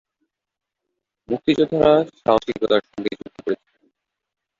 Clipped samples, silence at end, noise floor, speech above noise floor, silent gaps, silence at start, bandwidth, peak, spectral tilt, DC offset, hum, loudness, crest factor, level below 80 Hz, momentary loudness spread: under 0.1%; 1.05 s; -80 dBFS; 61 dB; none; 1.3 s; 7.4 kHz; -2 dBFS; -6.5 dB/octave; under 0.1%; none; -20 LUFS; 20 dB; -54 dBFS; 13 LU